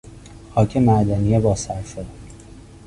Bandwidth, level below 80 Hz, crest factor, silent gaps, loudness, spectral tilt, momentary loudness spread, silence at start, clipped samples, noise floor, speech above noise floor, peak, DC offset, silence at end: 11.5 kHz; -38 dBFS; 16 dB; none; -19 LUFS; -7.5 dB/octave; 17 LU; 0.05 s; under 0.1%; -42 dBFS; 23 dB; -4 dBFS; under 0.1%; 0.25 s